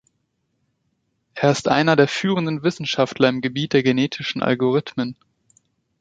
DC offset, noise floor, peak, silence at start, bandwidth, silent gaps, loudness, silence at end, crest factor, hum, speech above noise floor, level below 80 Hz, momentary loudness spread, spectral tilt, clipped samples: under 0.1%; -72 dBFS; -2 dBFS; 1.35 s; 9.2 kHz; none; -20 LUFS; 0.85 s; 20 dB; none; 52 dB; -60 dBFS; 7 LU; -5.5 dB/octave; under 0.1%